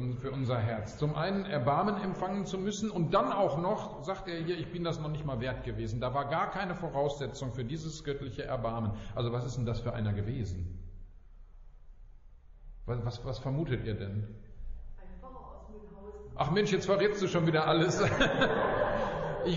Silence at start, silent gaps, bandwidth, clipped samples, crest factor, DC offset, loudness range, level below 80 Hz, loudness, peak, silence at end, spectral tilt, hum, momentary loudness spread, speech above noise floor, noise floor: 0 s; none; 7.6 kHz; under 0.1%; 18 dB; under 0.1%; 10 LU; -48 dBFS; -32 LUFS; -14 dBFS; 0 s; -5 dB/octave; none; 21 LU; 21 dB; -53 dBFS